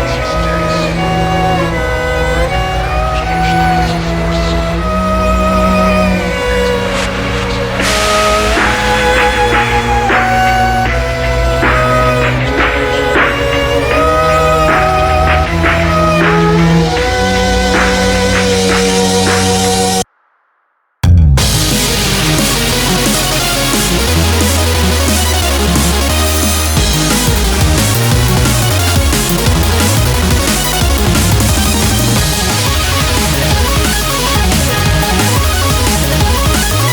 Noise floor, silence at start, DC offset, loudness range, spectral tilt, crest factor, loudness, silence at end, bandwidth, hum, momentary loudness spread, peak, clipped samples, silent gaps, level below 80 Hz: -60 dBFS; 0 s; under 0.1%; 2 LU; -4 dB/octave; 10 dB; -11 LUFS; 0 s; over 20 kHz; none; 4 LU; 0 dBFS; under 0.1%; none; -18 dBFS